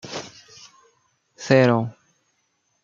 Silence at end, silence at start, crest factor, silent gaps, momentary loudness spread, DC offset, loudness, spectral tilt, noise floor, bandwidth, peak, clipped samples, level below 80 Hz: 0.9 s; 0.05 s; 22 dB; none; 24 LU; under 0.1%; -20 LUFS; -6 dB/octave; -70 dBFS; 7.6 kHz; -2 dBFS; under 0.1%; -68 dBFS